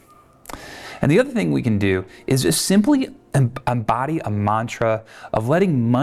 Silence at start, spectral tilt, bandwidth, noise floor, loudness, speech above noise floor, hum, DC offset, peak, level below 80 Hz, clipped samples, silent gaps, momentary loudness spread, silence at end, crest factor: 0.5 s; -5.5 dB/octave; 15 kHz; -45 dBFS; -20 LUFS; 26 dB; none; under 0.1%; -6 dBFS; -48 dBFS; under 0.1%; none; 10 LU; 0 s; 14 dB